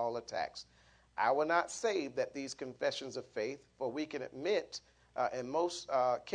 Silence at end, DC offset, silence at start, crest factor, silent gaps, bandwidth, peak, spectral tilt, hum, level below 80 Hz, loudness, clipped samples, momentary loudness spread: 0 s; under 0.1%; 0 s; 20 dB; none; 10.5 kHz; -18 dBFS; -3.5 dB/octave; none; -74 dBFS; -36 LUFS; under 0.1%; 10 LU